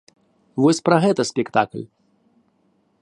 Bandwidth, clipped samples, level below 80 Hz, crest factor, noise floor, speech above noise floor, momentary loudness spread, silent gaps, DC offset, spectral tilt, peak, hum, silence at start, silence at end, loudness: 11.5 kHz; under 0.1%; -66 dBFS; 20 dB; -64 dBFS; 45 dB; 17 LU; none; under 0.1%; -5.5 dB/octave; -2 dBFS; none; 0.55 s; 1.15 s; -19 LUFS